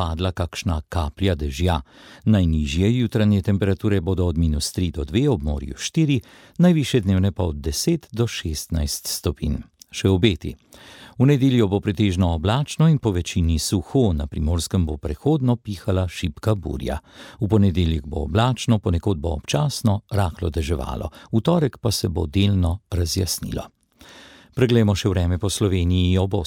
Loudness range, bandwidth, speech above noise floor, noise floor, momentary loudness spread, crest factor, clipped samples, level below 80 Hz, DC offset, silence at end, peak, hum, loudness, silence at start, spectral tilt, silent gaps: 3 LU; 17.5 kHz; 27 dB; -47 dBFS; 8 LU; 18 dB; under 0.1%; -34 dBFS; under 0.1%; 0 s; -2 dBFS; none; -22 LUFS; 0 s; -6 dB/octave; none